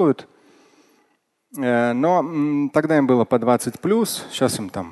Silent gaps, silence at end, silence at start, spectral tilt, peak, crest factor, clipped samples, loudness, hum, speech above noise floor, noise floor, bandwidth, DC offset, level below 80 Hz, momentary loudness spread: none; 0 s; 0 s; -5.5 dB/octave; -2 dBFS; 18 dB; under 0.1%; -20 LUFS; none; 47 dB; -66 dBFS; 12.5 kHz; under 0.1%; -60 dBFS; 8 LU